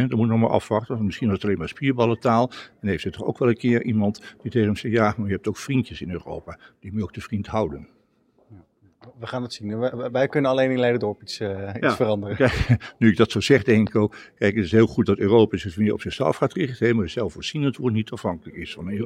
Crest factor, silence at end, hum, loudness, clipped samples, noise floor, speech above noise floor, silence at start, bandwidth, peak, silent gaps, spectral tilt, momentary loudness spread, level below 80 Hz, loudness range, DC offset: 20 dB; 0 s; none; -23 LUFS; under 0.1%; -62 dBFS; 40 dB; 0 s; 12 kHz; -2 dBFS; none; -7 dB/octave; 12 LU; -48 dBFS; 10 LU; under 0.1%